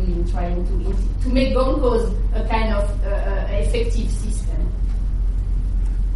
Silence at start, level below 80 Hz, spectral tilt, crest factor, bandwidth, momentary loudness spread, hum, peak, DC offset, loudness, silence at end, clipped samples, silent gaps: 0 s; -20 dBFS; -7 dB/octave; 14 dB; 11 kHz; 6 LU; none; -6 dBFS; under 0.1%; -22 LUFS; 0 s; under 0.1%; none